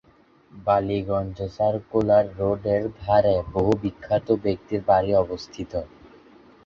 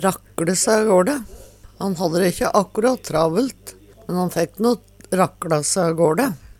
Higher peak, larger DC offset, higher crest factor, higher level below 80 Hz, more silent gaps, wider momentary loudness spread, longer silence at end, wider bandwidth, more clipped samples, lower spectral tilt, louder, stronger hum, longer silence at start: second, -6 dBFS vs -2 dBFS; neither; about the same, 18 dB vs 18 dB; about the same, -46 dBFS vs -48 dBFS; neither; about the same, 12 LU vs 11 LU; first, 0.8 s vs 0.15 s; second, 7 kHz vs 18 kHz; neither; first, -8 dB/octave vs -4.5 dB/octave; second, -23 LUFS vs -20 LUFS; neither; first, 0.55 s vs 0 s